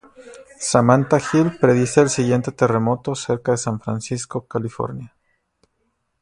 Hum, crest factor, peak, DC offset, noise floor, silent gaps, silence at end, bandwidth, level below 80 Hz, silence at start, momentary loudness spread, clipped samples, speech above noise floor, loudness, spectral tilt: none; 20 dB; 0 dBFS; under 0.1%; -70 dBFS; none; 1.15 s; 11.5 kHz; -54 dBFS; 0.2 s; 12 LU; under 0.1%; 51 dB; -19 LUFS; -6 dB/octave